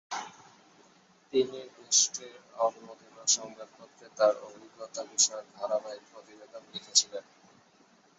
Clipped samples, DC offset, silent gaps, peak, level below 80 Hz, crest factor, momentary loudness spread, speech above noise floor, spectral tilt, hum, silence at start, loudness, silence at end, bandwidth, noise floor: under 0.1%; under 0.1%; none; -8 dBFS; -82 dBFS; 24 dB; 24 LU; 31 dB; -0.5 dB/octave; none; 0.1 s; -28 LUFS; 1 s; 8 kHz; -63 dBFS